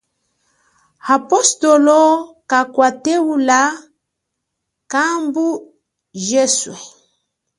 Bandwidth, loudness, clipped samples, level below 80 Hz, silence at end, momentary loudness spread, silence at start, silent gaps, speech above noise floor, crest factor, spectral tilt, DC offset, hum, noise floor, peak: 11.5 kHz; -15 LUFS; under 0.1%; -68 dBFS; 0.7 s; 16 LU; 1.05 s; none; 62 dB; 16 dB; -2 dB/octave; under 0.1%; none; -76 dBFS; 0 dBFS